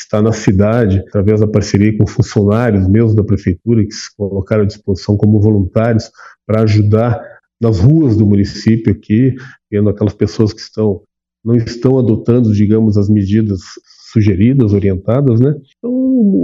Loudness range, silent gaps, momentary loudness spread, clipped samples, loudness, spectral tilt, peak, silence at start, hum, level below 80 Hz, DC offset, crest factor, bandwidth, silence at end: 2 LU; none; 8 LU; under 0.1%; -13 LUFS; -8 dB/octave; 0 dBFS; 0 s; none; -42 dBFS; under 0.1%; 12 dB; 7.6 kHz; 0 s